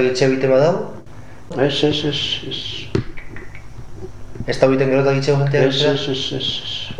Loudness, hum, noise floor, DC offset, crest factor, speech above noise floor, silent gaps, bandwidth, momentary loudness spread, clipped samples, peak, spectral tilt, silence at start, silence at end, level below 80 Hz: -18 LUFS; none; -39 dBFS; 2%; 18 dB; 21 dB; none; 10 kHz; 21 LU; under 0.1%; 0 dBFS; -5.5 dB/octave; 0 s; 0 s; -40 dBFS